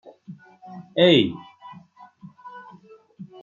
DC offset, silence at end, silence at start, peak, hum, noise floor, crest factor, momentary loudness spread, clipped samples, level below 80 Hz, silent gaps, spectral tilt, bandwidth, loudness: under 0.1%; 0.2 s; 0.3 s; -4 dBFS; none; -50 dBFS; 22 dB; 28 LU; under 0.1%; -68 dBFS; none; -6.5 dB/octave; 7.2 kHz; -19 LUFS